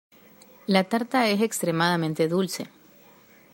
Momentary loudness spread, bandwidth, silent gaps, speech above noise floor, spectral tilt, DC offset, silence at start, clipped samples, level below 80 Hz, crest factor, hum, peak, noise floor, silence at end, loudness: 11 LU; 16 kHz; none; 30 dB; -5 dB/octave; under 0.1%; 0.7 s; under 0.1%; -72 dBFS; 22 dB; none; -4 dBFS; -54 dBFS; 0.85 s; -24 LUFS